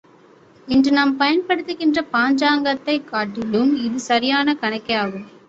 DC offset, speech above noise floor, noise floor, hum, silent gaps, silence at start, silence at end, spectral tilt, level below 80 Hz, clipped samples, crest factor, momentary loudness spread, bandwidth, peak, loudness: under 0.1%; 31 dB; -50 dBFS; none; none; 0.65 s; 0.2 s; -4.5 dB/octave; -56 dBFS; under 0.1%; 16 dB; 6 LU; 8 kHz; -4 dBFS; -19 LUFS